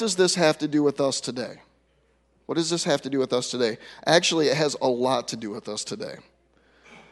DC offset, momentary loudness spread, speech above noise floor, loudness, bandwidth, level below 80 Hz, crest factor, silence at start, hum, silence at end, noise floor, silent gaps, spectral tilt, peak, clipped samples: under 0.1%; 13 LU; 41 dB; -24 LUFS; 11.5 kHz; -68 dBFS; 22 dB; 0 s; none; 0.1 s; -65 dBFS; none; -3.5 dB/octave; -4 dBFS; under 0.1%